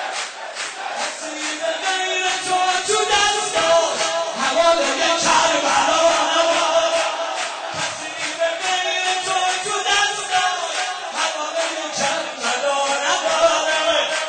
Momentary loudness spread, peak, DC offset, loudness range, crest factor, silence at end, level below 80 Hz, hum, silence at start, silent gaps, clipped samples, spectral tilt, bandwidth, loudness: 9 LU; -4 dBFS; under 0.1%; 4 LU; 16 dB; 0 s; -58 dBFS; none; 0 s; none; under 0.1%; 0 dB/octave; 9.4 kHz; -19 LUFS